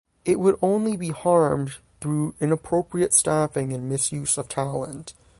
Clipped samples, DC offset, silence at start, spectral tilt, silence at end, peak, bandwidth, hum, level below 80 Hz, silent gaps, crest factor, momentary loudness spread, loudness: under 0.1%; under 0.1%; 0.25 s; -5 dB/octave; 0.3 s; -4 dBFS; 11.5 kHz; none; -54 dBFS; none; 20 dB; 10 LU; -23 LUFS